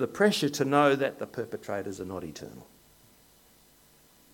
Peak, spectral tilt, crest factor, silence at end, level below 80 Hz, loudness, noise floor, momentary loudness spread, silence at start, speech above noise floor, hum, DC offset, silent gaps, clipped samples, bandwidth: -8 dBFS; -5 dB/octave; 22 dB; 1.7 s; -68 dBFS; -28 LUFS; -60 dBFS; 17 LU; 0 s; 32 dB; none; under 0.1%; none; under 0.1%; 17.5 kHz